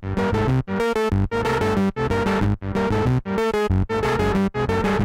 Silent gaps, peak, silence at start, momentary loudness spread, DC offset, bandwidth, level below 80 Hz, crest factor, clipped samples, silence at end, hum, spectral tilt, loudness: none; -10 dBFS; 0 s; 2 LU; under 0.1%; 15.5 kHz; -34 dBFS; 10 dB; under 0.1%; 0 s; none; -7 dB/octave; -21 LUFS